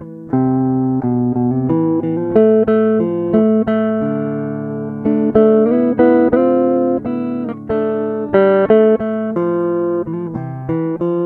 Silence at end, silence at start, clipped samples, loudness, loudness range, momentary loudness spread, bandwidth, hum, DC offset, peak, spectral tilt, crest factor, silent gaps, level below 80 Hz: 0 s; 0 s; under 0.1%; -15 LUFS; 1 LU; 10 LU; 4.2 kHz; none; under 0.1%; 0 dBFS; -11.5 dB/octave; 14 dB; none; -48 dBFS